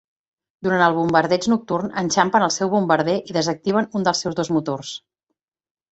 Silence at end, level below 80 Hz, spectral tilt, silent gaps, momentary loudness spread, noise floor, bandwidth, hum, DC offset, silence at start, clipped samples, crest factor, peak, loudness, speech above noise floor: 0.95 s; -60 dBFS; -4.5 dB/octave; none; 8 LU; -79 dBFS; 8.2 kHz; none; under 0.1%; 0.6 s; under 0.1%; 20 dB; -2 dBFS; -20 LUFS; 59 dB